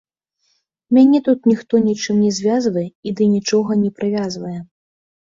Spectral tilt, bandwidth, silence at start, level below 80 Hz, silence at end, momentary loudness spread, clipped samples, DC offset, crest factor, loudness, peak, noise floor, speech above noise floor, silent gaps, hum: -6 dB/octave; 7.6 kHz; 0.9 s; -60 dBFS; 0.6 s; 12 LU; under 0.1%; under 0.1%; 14 dB; -17 LUFS; -2 dBFS; -67 dBFS; 51 dB; 2.95-3.03 s; none